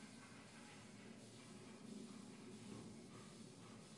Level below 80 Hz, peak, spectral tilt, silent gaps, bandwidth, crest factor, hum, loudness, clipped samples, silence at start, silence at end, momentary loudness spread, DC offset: -84 dBFS; -42 dBFS; -4.5 dB/octave; none; 11.5 kHz; 16 dB; none; -58 LUFS; under 0.1%; 0 s; 0 s; 3 LU; under 0.1%